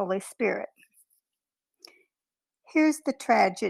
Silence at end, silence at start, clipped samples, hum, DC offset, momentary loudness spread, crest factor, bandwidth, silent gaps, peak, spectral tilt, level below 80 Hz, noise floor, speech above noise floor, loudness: 0 s; 0 s; under 0.1%; none; under 0.1%; 10 LU; 20 dB; 14 kHz; none; -8 dBFS; -4.5 dB/octave; -76 dBFS; under -90 dBFS; over 64 dB; -26 LUFS